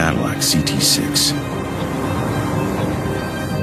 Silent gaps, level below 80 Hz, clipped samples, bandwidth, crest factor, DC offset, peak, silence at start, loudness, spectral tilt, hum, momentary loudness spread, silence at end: none; -36 dBFS; under 0.1%; 15.5 kHz; 18 dB; under 0.1%; -2 dBFS; 0 s; -18 LUFS; -3.5 dB/octave; none; 8 LU; 0 s